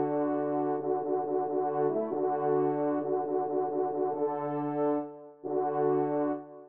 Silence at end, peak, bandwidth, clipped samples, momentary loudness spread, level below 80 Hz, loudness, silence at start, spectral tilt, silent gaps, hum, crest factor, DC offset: 0 s; -18 dBFS; 3.3 kHz; under 0.1%; 4 LU; -84 dBFS; -30 LUFS; 0 s; -9 dB/octave; none; none; 12 dB; under 0.1%